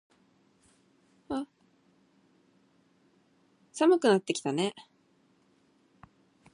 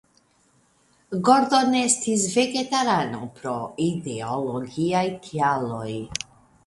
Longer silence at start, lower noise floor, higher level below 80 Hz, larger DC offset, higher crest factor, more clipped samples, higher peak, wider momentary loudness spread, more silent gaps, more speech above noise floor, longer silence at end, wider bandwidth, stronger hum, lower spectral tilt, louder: first, 1.3 s vs 1.1 s; first, -67 dBFS vs -62 dBFS; second, -74 dBFS vs -60 dBFS; neither; about the same, 22 dB vs 20 dB; neither; second, -12 dBFS vs -4 dBFS; first, 22 LU vs 12 LU; neither; about the same, 41 dB vs 39 dB; first, 1.75 s vs 0.45 s; about the same, 11 kHz vs 11.5 kHz; neither; about the same, -5 dB/octave vs -4 dB/octave; second, -28 LUFS vs -23 LUFS